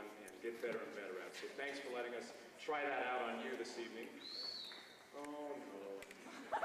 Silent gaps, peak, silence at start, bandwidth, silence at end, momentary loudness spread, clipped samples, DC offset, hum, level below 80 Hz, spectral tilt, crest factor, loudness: none; -30 dBFS; 0 s; 15 kHz; 0 s; 12 LU; under 0.1%; under 0.1%; none; -86 dBFS; -2.5 dB/octave; 16 dB; -46 LUFS